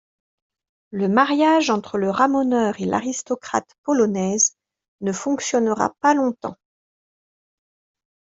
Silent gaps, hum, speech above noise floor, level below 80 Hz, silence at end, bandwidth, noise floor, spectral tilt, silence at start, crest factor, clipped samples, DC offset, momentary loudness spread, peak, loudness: 3.78-3.84 s, 4.88-4.99 s; none; over 70 dB; -64 dBFS; 1.85 s; 8 kHz; under -90 dBFS; -4 dB/octave; 0.9 s; 20 dB; under 0.1%; under 0.1%; 10 LU; -2 dBFS; -20 LUFS